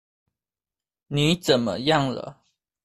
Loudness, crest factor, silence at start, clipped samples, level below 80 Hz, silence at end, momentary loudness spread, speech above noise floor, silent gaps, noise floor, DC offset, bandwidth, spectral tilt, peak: -23 LUFS; 20 dB; 1.1 s; under 0.1%; -54 dBFS; 0.5 s; 12 LU; over 68 dB; none; under -90 dBFS; under 0.1%; 14 kHz; -5 dB/octave; -6 dBFS